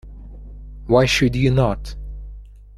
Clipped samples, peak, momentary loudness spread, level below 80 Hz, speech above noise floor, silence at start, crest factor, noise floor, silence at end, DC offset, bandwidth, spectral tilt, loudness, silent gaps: under 0.1%; -2 dBFS; 24 LU; -32 dBFS; 21 dB; 0.05 s; 20 dB; -38 dBFS; 0 s; under 0.1%; 13.5 kHz; -6 dB/octave; -18 LUFS; none